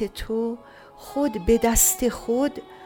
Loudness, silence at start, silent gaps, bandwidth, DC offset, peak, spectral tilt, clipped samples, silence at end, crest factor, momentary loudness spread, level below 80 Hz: -22 LUFS; 0 s; none; 17.5 kHz; under 0.1%; -4 dBFS; -3.5 dB/octave; under 0.1%; 0 s; 20 dB; 12 LU; -38 dBFS